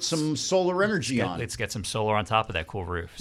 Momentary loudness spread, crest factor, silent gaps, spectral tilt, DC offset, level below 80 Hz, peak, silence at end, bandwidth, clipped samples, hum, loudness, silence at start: 7 LU; 18 dB; none; -4 dB/octave; under 0.1%; -50 dBFS; -10 dBFS; 0 s; 16 kHz; under 0.1%; none; -27 LUFS; 0 s